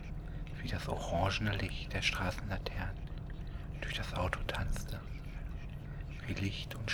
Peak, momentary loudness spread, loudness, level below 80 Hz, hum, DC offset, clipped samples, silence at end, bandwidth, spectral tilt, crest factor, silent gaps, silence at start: -16 dBFS; 12 LU; -39 LUFS; -44 dBFS; none; under 0.1%; under 0.1%; 0 s; 19 kHz; -5 dB/octave; 22 dB; none; 0 s